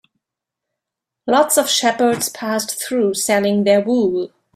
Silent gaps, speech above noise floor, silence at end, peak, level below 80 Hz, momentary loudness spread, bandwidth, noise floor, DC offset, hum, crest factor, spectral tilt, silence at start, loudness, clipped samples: none; 67 dB; 0.3 s; -2 dBFS; -62 dBFS; 7 LU; 16 kHz; -83 dBFS; under 0.1%; none; 16 dB; -3 dB/octave; 1.25 s; -17 LUFS; under 0.1%